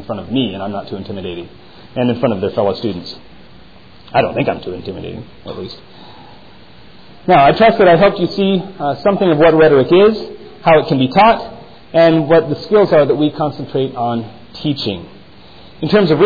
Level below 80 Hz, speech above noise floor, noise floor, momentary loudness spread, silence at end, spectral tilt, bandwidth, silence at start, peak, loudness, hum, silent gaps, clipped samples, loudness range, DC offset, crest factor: -46 dBFS; 29 dB; -42 dBFS; 19 LU; 0 s; -8.5 dB/octave; 5 kHz; 0 s; -2 dBFS; -13 LUFS; none; none; under 0.1%; 11 LU; 0.9%; 14 dB